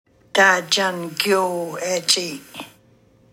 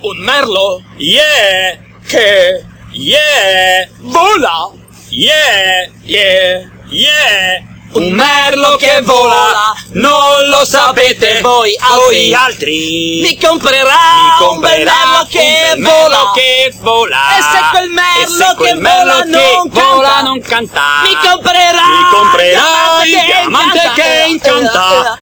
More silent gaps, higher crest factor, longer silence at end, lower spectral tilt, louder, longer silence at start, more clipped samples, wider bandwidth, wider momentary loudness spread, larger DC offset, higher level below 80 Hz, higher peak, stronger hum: neither; first, 20 dB vs 8 dB; first, 0.65 s vs 0.05 s; about the same, -2 dB/octave vs -1.5 dB/octave; second, -19 LUFS vs -7 LUFS; first, 0.35 s vs 0.05 s; second, under 0.1% vs 1%; second, 16.5 kHz vs over 20 kHz; first, 17 LU vs 7 LU; neither; second, -70 dBFS vs -44 dBFS; about the same, -2 dBFS vs 0 dBFS; neither